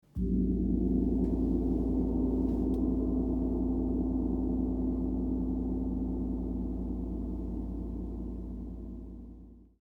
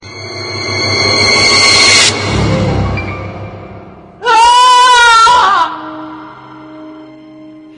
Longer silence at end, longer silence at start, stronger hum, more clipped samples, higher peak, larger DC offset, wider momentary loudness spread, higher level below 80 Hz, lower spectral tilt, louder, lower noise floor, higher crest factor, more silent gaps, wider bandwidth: about the same, 0.25 s vs 0.15 s; about the same, 0.15 s vs 0.05 s; neither; second, under 0.1% vs 0.1%; second, -16 dBFS vs 0 dBFS; neither; second, 11 LU vs 20 LU; second, -38 dBFS vs -32 dBFS; first, -12 dB/octave vs -2.5 dB/octave; second, -32 LUFS vs -7 LUFS; first, -51 dBFS vs -33 dBFS; about the same, 14 dB vs 10 dB; neither; second, 1.4 kHz vs 12 kHz